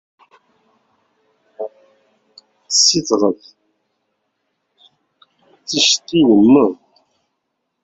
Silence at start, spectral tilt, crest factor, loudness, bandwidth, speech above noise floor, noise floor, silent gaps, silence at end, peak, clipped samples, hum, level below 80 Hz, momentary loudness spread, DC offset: 1.6 s; -3 dB/octave; 18 dB; -13 LUFS; 8 kHz; 60 dB; -73 dBFS; none; 1.1 s; -2 dBFS; under 0.1%; none; -60 dBFS; 20 LU; under 0.1%